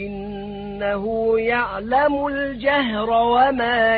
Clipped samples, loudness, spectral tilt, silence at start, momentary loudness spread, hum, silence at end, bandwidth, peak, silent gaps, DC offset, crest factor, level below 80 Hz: under 0.1%; -20 LUFS; -10 dB/octave; 0 s; 13 LU; none; 0 s; 4.9 kHz; -4 dBFS; none; under 0.1%; 16 dB; -44 dBFS